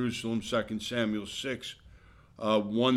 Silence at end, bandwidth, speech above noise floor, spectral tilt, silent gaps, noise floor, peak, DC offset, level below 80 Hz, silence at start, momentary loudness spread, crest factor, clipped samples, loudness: 0 s; 14 kHz; 26 dB; -5 dB/octave; none; -56 dBFS; -12 dBFS; under 0.1%; -60 dBFS; 0 s; 10 LU; 18 dB; under 0.1%; -32 LUFS